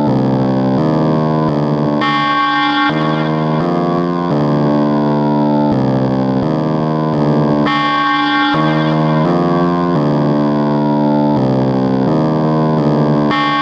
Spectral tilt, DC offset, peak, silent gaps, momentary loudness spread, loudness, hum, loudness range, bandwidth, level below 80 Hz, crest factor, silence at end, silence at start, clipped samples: -8 dB/octave; under 0.1%; -2 dBFS; none; 2 LU; -14 LUFS; none; 1 LU; 7.2 kHz; -44 dBFS; 12 dB; 0 s; 0 s; under 0.1%